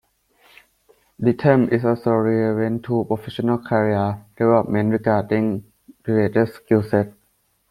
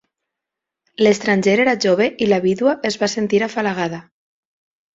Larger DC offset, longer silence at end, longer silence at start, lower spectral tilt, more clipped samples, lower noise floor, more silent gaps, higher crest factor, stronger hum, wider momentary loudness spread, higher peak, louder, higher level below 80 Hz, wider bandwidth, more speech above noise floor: neither; second, 0.6 s vs 0.95 s; first, 1.2 s vs 1 s; first, -9 dB/octave vs -5 dB/octave; neither; second, -65 dBFS vs -84 dBFS; neither; about the same, 18 dB vs 16 dB; neither; about the same, 6 LU vs 6 LU; about the same, -2 dBFS vs -2 dBFS; second, -20 LUFS vs -17 LUFS; about the same, -56 dBFS vs -60 dBFS; first, 14 kHz vs 7.8 kHz; second, 46 dB vs 67 dB